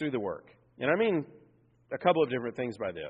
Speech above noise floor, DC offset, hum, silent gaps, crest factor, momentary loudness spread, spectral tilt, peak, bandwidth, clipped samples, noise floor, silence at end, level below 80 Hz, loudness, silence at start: 33 dB; under 0.1%; none; none; 20 dB; 14 LU; -4.5 dB/octave; -12 dBFS; 7.2 kHz; under 0.1%; -63 dBFS; 0 s; -72 dBFS; -30 LUFS; 0 s